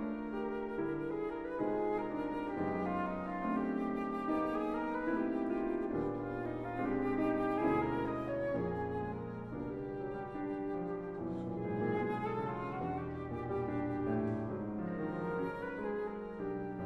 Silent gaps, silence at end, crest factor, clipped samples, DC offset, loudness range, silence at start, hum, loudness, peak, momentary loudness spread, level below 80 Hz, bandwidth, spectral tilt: none; 0 s; 16 dB; under 0.1%; under 0.1%; 3 LU; 0 s; none; -37 LUFS; -20 dBFS; 7 LU; -58 dBFS; 7.6 kHz; -9 dB/octave